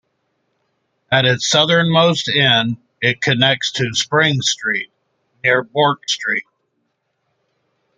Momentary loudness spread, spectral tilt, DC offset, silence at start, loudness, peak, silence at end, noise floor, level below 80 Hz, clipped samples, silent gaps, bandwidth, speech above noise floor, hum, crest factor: 8 LU; -3.5 dB/octave; under 0.1%; 1.1 s; -15 LUFS; 0 dBFS; 1.55 s; -70 dBFS; -58 dBFS; under 0.1%; none; 9.4 kHz; 54 dB; none; 18 dB